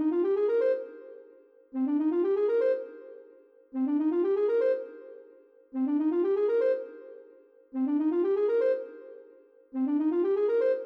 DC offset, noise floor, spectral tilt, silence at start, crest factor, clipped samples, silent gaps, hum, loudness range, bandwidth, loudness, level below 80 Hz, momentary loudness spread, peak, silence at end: under 0.1%; -56 dBFS; -7.5 dB/octave; 0 s; 10 dB; under 0.1%; none; none; 2 LU; 5.6 kHz; -28 LUFS; -78 dBFS; 22 LU; -18 dBFS; 0 s